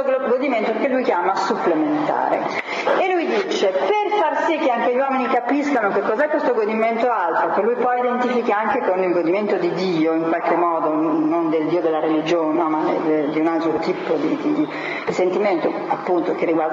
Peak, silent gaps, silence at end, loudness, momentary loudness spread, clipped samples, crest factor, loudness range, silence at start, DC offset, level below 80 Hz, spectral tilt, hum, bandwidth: -6 dBFS; none; 0 s; -19 LUFS; 2 LU; under 0.1%; 12 dB; 1 LU; 0 s; under 0.1%; -70 dBFS; -6 dB/octave; none; 7.6 kHz